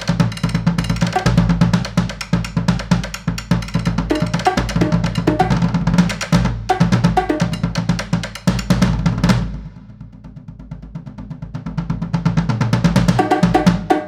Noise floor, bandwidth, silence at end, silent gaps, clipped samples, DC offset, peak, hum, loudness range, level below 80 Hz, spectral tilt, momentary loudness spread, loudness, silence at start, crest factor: -37 dBFS; 13 kHz; 0 s; none; under 0.1%; under 0.1%; 0 dBFS; none; 5 LU; -30 dBFS; -6.5 dB/octave; 18 LU; -17 LUFS; 0 s; 16 dB